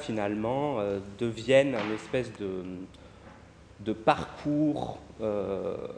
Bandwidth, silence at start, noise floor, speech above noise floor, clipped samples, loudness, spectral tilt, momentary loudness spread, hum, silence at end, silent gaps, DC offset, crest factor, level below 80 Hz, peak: 10 kHz; 0 s; -52 dBFS; 22 dB; under 0.1%; -30 LUFS; -6.5 dB/octave; 14 LU; none; 0 s; none; under 0.1%; 22 dB; -58 dBFS; -8 dBFS